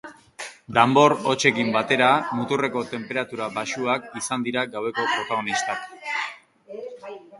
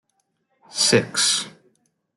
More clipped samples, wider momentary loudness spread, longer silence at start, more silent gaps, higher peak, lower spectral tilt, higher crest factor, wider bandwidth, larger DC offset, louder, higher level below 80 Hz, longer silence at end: neither; first, 19 LU vs 15 LU; second, 0.05 s vs 0.7 s; neither; about the same, -2 dBFS vs -4 dBFS; first, -4 dB/octave vs -2 dB/octave; about the same, 22 dB vs 20 dB; about the same, 11.5 kHz vs 12 kHz; neither; second, -23 LUFS vs -19 LUFS; about the same, -66 dBFS vs -68 dBFS; second, 0 s vs 0.7 s